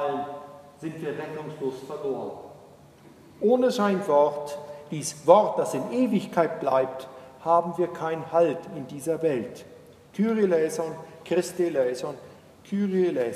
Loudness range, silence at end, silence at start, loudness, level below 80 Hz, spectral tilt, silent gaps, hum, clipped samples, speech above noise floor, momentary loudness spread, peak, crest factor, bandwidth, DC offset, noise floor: 5 LU; 0 s; 0 s; -26 LUFS; -70 dBFS; -6 dB/octave; none; none; under 0.1%; 26 dB; 17 LU; -2 dBFS; 24 dB; 14.5 kHz; under 0.1%; -51 dBFS